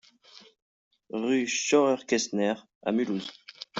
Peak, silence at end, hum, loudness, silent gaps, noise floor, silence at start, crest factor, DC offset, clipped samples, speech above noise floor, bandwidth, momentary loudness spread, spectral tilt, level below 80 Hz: -10 dBFS; 0 s; none; -27 LUFS; 0.62-0.91 s, 2.75-2.81 s; -55 dBFS; 0.35 s; 18 dB; under 0.1%; under 0.1%; 29 dB; 8 kHz; 13 LU; -3.5 dB/octave; -74 dBFS